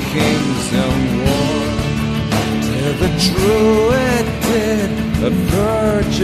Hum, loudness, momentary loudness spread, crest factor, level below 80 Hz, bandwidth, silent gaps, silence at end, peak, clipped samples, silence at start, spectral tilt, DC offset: none; -16 LUFS; 5 LU; 14 dB; -28 dBFS; 15.5 kHz; none; 0 s; -2 dBFS; under 0.1%; 0 s; -5.5 dB/octave; under 0.1%